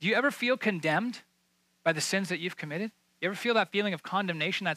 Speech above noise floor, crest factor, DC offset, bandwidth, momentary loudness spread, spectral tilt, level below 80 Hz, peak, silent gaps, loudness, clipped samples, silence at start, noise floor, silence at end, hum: 42 dB; 18 dB; under 0.1%; 15.5 kHz; 9 LU; -4 dB/octave; -84 dBFS; -14 dBFS; none; -30 LUFS; under 0.1%; 0 s; -72 dBFS; 0 s; none